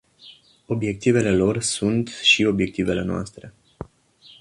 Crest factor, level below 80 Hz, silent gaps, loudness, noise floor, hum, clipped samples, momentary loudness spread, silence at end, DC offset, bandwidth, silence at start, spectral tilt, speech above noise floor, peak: 18 dB; -48 dBFS; none; -21 LUFS; -52 dBFS; none; under 0.1%; 23 LU; 0.55 s; under 0.1%; 11.5 kHz; 0.25 s; -4.5 dB/octave; 31 dB; -4 dBFS